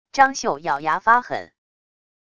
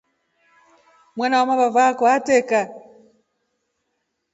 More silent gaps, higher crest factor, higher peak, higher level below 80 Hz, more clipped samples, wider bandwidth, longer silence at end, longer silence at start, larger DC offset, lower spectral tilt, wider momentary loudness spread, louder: neither; about the same, 20 dB vs 18 dB; about the same, -2 dBFS vs -4 dBFS; first, -60 dBFS vs -70 dBFS; neither; first, 10 kHz vs 8 kHz; second, 0.85 s vs 1.55 s; second, 0.15 s vs 1.15 s; first, 0.4% vs under 0.1%; about the same, -2.5 dB/octave vs -3.5 dB/octave; about the same, 11 LU vs 11 LU; about the same, -19 LUFS vs -18 LUFS